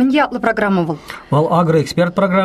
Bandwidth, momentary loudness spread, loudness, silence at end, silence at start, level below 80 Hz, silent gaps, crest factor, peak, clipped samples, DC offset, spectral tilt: 13.5 kHz; 5 LU; -16 LUFS; 0 s; 0 s; -48 dBFS; none; 12 dB; -2 dBFS; under 0.1%; under 0.1%; -7 dB/octave